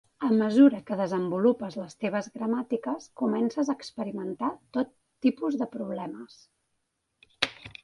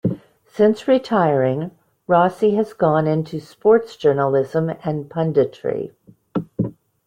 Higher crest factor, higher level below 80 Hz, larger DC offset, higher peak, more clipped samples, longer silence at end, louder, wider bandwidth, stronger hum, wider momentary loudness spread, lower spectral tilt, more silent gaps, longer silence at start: first, 26 dB vs 16 dB; second, -70 dBFS vs -58 dBFS; neither; about the same, -2 dBFS vs -2 dBFS; neither; second, 0.15 s vs 0.35 s; second, -28 LUFS vs -19 LUFS; first, 11.5 kHz vs 10 kHz; neither; about the same, 13 LU vs 12 LU; second, -6 dB/octave vs -8.5 dB/octave; neither; first, 0.2 s vs 0.05 s